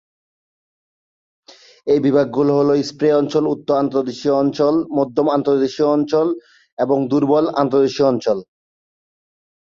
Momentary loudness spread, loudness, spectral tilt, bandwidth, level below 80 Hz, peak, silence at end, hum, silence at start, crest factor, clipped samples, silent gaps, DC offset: 5 LU; -17 LUFS; -7 dB/octave; 7.4 kHz; -60 dBFS; -2 dBFS; 1.3 s; none; 1.85 s; 16 dB; under 0.1%; 6.72-6.77 s; under 0.1%